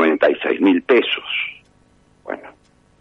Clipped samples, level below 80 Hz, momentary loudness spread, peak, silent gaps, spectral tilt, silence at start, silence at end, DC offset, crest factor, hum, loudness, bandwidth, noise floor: under 0.1%; -62 dBFS; 16 LU; -2 dBFS; none; -6 dB/octave; 0 s; 0.5 s; under 0.1%; 18 dB; none; -17 LUFS; 5.8 kHz; -55 dBFS